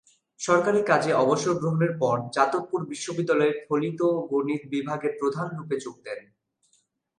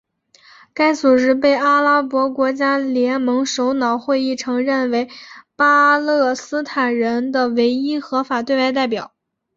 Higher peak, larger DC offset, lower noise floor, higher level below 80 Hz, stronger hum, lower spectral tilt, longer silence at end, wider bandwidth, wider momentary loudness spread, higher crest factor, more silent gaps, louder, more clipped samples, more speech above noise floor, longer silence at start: about the same, -6 dBFS vs -4 dBFS; neither; first, -69 dBFS vs -51 dBFS; second, -72 dBFS vs -64 dBFS; neither; first, -5.5 dB/octave vs -3.5 dB/octave; first, 1 s vs 0.5 s; first, 11.5 kHz vs 7.6 kHz; about the same, 10 LU vs 8 LU; about the same, 18 dB vs 14 dB; neither; second, -25 LUFS vs -17 LUFS; neither; first, 44 dB vs 34 dB; second, 0.4 s vs 0.75 s